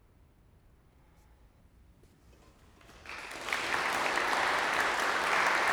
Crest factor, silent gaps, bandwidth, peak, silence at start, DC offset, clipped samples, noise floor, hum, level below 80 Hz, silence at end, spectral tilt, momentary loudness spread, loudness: 20 dB; none; over 20 kHz; -14 dBFS; 2.9 s; under 0.1%; under 0.1%; -62 dBFS; none; -62 dBFS; 0 s; -1.5 dB/octave; 15 LU; -29 LUFS